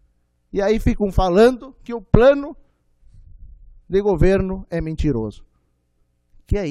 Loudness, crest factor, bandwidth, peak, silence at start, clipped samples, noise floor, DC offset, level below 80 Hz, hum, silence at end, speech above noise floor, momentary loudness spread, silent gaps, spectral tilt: -18 LUFS; 20 dB; 13 kHz; 0 dBFS; 0.55 s; under 0.1%; -65 dBFS; under 0.1%; -30 dBFS; 60 Hz at -45 dBFS; 0 s; 47 dB; 17 LU; none; -7.5 dB/octave